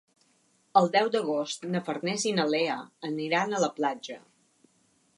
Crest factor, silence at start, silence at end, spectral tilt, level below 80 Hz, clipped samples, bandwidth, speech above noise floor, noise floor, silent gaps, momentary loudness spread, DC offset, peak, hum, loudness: 22 dB; 0.75 s; 1 s; -4 dB/octave; -82 dBFS; under 0.1%; 11.5 kHz; 40 dB; -68 dBFS; none; 11 LU; under 0.1%; -6 dBFS; none; -28 LUFS